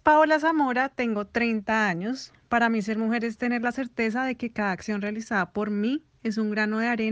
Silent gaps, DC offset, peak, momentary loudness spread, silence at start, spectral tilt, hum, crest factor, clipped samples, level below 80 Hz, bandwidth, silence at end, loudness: none; under 0.1%; -6 dBFS; 7 LU; 0.05 s; -5.5 dB/octave; none; 20 dB; under 0.1%; -60 dBFS; 8.4 kHz; 0 s; -26 LUFS